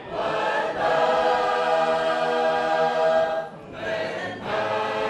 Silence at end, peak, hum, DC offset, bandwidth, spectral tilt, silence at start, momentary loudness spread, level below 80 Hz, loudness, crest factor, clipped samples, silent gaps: 0 s; -10 dBFS; none; under 0.1%; 10.5 kHz; -4 dB/octave; 0 s; 9 LU; -58 dBFS; -23 LUFS; 14 dB; under 0.1%; none